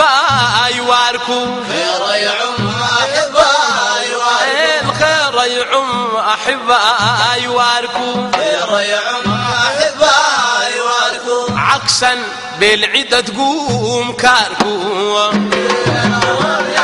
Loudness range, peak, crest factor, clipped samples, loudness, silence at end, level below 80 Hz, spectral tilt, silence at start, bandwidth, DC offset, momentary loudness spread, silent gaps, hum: 1 LU; 0 dBFS; 14 dB; under 0.1%; -12 LUFS; 0 s; -48 dBFS; -2.5 dB/octave; 0 s; 12 kHz; under 0.1%; 6 LU; none; none